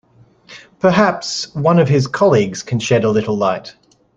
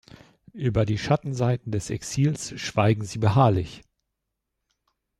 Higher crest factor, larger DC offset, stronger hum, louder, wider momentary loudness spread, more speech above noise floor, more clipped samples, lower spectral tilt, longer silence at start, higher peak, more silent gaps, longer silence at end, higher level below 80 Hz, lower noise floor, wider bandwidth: about the same, 16 dB vs 18 dB; neither; neither; first, -15 LUFS vs -24 LUFS; about the same, 8 LU vs 10 LU; second, 32 dB vs 58 dB; neither; about the same, -6 dB/octave vs -6.5 dB/octave; about the same, 0.5 s vs 0.55 s; first, 0 dBFS vs -8 dBFS; neither; second, 0.45 s vs 1.4 s; about the same, -54 dBFS vs -50 dBFS; second, -47 dBFS vs -82 dBFS; second, 9.4 kHz vs 12.5 kHz